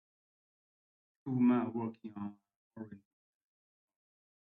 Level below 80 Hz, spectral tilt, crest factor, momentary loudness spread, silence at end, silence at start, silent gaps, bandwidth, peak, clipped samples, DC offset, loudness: -82 dBFS; -8.5 dB/octave; 20 dB; 21 LU; 1.6 s; 1.25 s; 2.56-2.71 s; 3.8 kHz; -20 dBFS; under 0.1%; under 0.1%; -34 LUFS